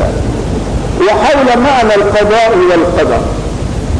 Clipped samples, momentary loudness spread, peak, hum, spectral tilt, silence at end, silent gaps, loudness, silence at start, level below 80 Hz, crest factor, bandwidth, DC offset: under 0.1%; 9 LU; -4 dBFS; none; -6 dB/octave; 0 s; none; -10 LUFS; 0 s; -20 dBFS; 6 dB; 11 kHz; under 0.1%